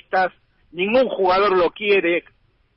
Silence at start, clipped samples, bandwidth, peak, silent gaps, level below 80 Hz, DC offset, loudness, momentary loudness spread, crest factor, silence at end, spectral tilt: 0.1 s; under 0.1%; 5.8 kHz; -6 dBFS; none; -54 dBFS; under 0.1%; -19 LUFS; 8 LU; 14 dB; 0.55 s; -2 dB/octave